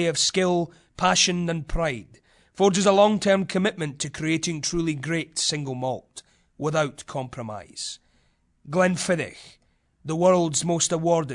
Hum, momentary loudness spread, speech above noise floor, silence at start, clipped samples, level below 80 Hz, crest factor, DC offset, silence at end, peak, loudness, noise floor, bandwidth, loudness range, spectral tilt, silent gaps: none; 15 LU; 41 dB; 0 s; under 0.1%; -46 dBFS; 18 dB; under 0.1%; 0 s; -6 dBFS; -23 LUFS; -65 dBFS; 11 kHz; 7 LU; -4 dB/octave; none